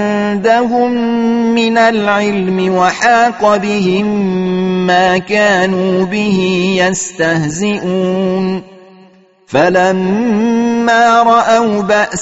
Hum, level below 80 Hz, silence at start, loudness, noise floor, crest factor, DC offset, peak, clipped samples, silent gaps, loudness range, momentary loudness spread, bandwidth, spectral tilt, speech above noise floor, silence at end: none; -50 dBFS; 0 s; -12 LUFS; -44 dBFS; 12 dB; 0.4%; 0 dBFS; under 0.1%; none; 3 LU; 5 LU; 8.2 kHz; -5 dB/octave; 33 dB; 0 s